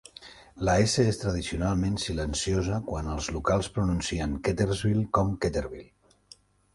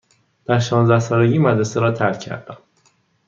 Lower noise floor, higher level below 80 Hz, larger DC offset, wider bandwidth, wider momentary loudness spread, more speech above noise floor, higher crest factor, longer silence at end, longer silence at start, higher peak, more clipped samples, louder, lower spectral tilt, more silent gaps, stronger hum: about the same, -57 dBFS vs -60 dBFS; first, -40 dBFS vs -60 dBFS; neither; first, 11.5 kHz vs 7.4 kHz; second, 9 LU vs 15 LU; second, 30 dB vs 43 dB; about the same, 18 dB vs 18 dB; first, 0.9 s vs 0.7 s; second, 0.2 s vs 0.5 s; second, -10 dBFS vs -2 dBFS; neither; second, -28 LUFS vs -17 LUFS; second, -5.5 dB/octave vs -7 dB/octave; neither; neither